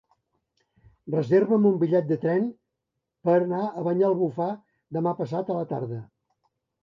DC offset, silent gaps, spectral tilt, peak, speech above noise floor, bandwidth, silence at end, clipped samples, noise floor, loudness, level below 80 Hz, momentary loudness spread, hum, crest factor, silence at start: under 0.1%; none; -10 dB/octave; -10 dBFS; 59 dB; 6.2 kHz; 0.8 s; under 0.1%; -83 dBFS; -25 LUFS; -72 dBFS; 11 LU; none; 16 dB; 1.05 s